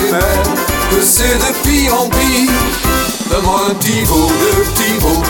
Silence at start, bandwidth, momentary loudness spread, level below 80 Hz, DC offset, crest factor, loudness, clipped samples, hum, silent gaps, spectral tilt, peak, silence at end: 0 s; 19.5 kHz; 4 LU; -22 dBFS; 0.2%; 12 dB; -12 LUFS; under 0.1%; none; none; -3.5 dB/octave; 0 dBFS; 0 s